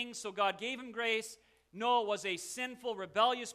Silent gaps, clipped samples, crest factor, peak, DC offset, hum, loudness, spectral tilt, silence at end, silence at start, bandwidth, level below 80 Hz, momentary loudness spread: none; under 0.1%; 20 dB; -16 dBFS; under 0.1%; none; -35 LUFS; -2 dB/octave; 0 s; 0 s; 14 kHz; -78 dBFS; 8 LU